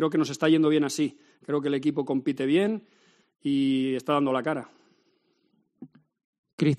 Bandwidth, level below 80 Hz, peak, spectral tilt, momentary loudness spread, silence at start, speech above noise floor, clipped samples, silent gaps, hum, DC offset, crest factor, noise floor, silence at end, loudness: 13 kHz; -72 dBFS; -10 dBFS; -6 dB/octave; 11 LU; 0 s; 45 dB; under 0.1%; 6.24-6.44 s, 6.53-6.58 s; none; under 0.1%; 18 dB; -70 dBFS; 0 s; -26 LUFS